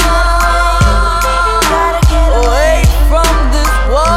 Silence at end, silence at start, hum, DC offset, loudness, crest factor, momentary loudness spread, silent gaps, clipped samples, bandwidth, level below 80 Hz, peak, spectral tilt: 0 s; 0 s; none; under 0.1%; -11 LUFS; 8 dB; 2 LU; none; under 0.1%; 15.5 kHz; -12 dBFS; 0 dBFS; -4.5 dB/octave